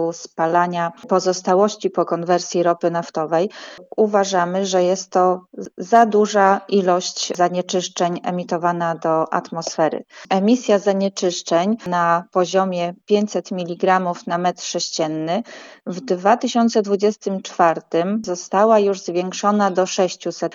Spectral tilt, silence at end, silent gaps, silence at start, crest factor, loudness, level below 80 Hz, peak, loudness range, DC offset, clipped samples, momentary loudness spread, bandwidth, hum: -4.5 dB/octave; 0 s; none; 0 s; 18 dB; -19 LUFS; -76 dBFS; -2 dBFS; 3 LU; under 0.1%; under 0.1%; 9 LU; 7.8 kHz; none